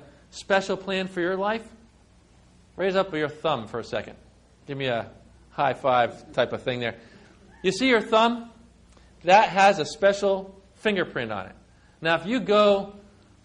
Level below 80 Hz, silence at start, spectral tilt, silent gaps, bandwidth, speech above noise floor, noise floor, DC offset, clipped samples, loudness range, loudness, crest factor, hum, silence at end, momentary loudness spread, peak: -58 dBFS; 0.35 s; -4.5 dB/octave; none; 11 kHz; 33 dB; -56 dBFS; under 0.1%; under 0.1%; 7 LU; -24 LUFS; 20 dB; none; 0.45 s; 15 LU; -6 dBFS